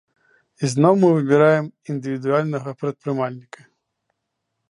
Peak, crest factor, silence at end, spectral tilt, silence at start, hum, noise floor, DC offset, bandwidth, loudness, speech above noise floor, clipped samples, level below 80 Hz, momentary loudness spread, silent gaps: -2 dBFS; 20 dB; 1.3 s; -7 dB/octave; 0.6 s; none; -77 dBFS; under 0.1%; 11.5 kHz; -20 LUFS; 58 dB; under 0.1%; -70 dBFS; 13 LU; none